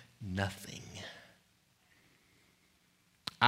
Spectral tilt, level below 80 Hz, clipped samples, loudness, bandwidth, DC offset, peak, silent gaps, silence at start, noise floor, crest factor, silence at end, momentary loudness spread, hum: -4 dB/octave; -72 dBFS; under 0.1%; -42 LUFS; 16 kHz; under 0.1%; -8 dBFS; none; 0 s; -71 dBFS; 32 dB; 0 s; 16 LU; none